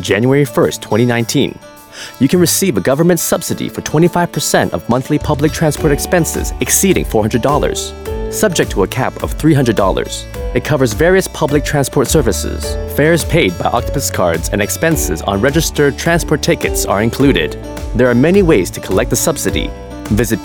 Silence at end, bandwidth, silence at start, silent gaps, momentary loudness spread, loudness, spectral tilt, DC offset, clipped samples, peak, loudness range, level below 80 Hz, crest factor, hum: 0 s; over 20 kHz; 0 s; none; 8 LU; -14 LUFS; -4.5 dB/octave; 0.1%; under 0.1%; 0 dBFS; 1 LU; -26 dBFS; 14 dB; none